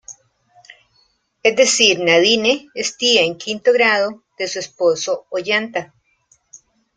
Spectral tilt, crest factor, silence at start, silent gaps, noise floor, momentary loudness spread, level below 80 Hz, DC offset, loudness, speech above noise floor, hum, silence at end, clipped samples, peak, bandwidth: -1.5 dB/octave; 18 dB; 0.1 s; none; -61 dBFS; 12 LU; -64 dBFS; under 0.1%; -16 LUFS; 44 dB; none; 1.1 s; under 0.1%; 0 dBFS; 9.6 kHz